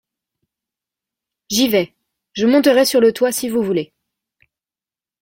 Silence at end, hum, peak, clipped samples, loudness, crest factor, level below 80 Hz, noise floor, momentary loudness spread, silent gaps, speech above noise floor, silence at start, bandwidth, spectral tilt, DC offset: 1.4 s; none; -2 dBFS; under 0.1%; -16 LUFS; 16 dB; -60 dBFS; under -90 dBFS; 13 LU; none; over 75 dB; 1.5 s; 16.5 kHz; -3.5 dB/octave; under 0.1%